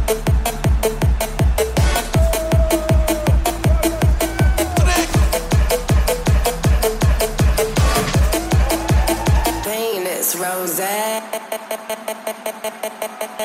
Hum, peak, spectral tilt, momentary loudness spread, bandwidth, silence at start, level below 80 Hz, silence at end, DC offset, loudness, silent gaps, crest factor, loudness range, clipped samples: none; -4 dBFS; -5 dB/octave; 9 LU; 16.5 kHz; 0 s; -20 dBFS; 0 s; under 0.1%; -18 LUFS; none; 14 dB; 4 LU; under 0.1%